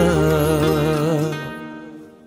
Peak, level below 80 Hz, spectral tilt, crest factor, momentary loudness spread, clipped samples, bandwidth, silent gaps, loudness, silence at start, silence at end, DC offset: -4 dBFS; -36 dBFS; -6.5 dB/octave; 14 dB; 18 LU; under 0.1%; 16 kHz; none; -19 LUFS; 0 s; 0.15 s; under 0.1%